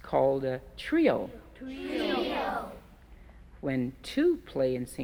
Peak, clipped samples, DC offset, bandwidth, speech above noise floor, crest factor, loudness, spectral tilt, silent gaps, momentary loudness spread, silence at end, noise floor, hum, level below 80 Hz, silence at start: -12 dBFS; under 0.1%; under 0.1%; 16.5 kHz; 23 dB; 18 dB; -30 LUFS; -6 dB/octave; none; 15 LU; 0 s; -52 dBFS; none; -54 dBFS; 0.05 s